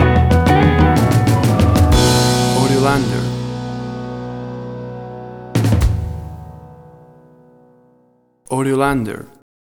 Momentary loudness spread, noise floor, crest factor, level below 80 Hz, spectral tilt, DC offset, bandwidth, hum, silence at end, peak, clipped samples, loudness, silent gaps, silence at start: 18 LU; -56 dBFS; 16 dB; -26 dBFS; -6 dB/octave; under 0.1%; 18 kHz; none; 0.4 s; 0 dBFS; under 0.1%; -15 LUFS; none; 0 s